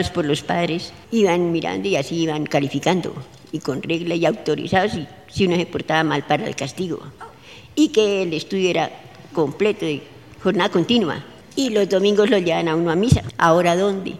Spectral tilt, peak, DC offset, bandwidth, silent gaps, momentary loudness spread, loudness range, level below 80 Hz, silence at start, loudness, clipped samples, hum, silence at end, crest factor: -5.5 dB/octave; -2 dBFS; 0.2%; 15 kHz; none; 12 LU; 4 LU; -46 dBFS; 0 s; -20 LUFS; under 0.1%; none; 0 s; 18 dB